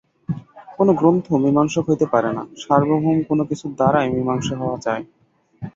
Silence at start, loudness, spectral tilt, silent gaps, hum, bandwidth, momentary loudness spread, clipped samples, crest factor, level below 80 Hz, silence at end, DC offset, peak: 0.3 s; -19 LUFS; -7 dB/octave; none; none; 7.8 kHz; 12 LU; under 0.1%; 18 dB; -54 dBFS; 0.05 s; under 0.1%; -2 dBFS